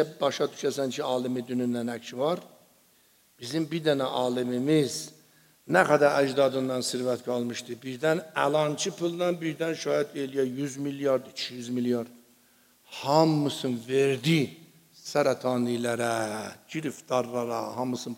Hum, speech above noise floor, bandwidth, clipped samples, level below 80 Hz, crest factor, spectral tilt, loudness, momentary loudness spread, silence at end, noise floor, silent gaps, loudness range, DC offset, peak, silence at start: none; 35 dB; 16 kHz; under 0.1%; -78 dBFS; 22 dB; -5 dB/octave; -28 LUFS; 11 LU; 0 s; -63 dBFS; none; 5 LU; under 0.1%; -6 dBFS; 0 s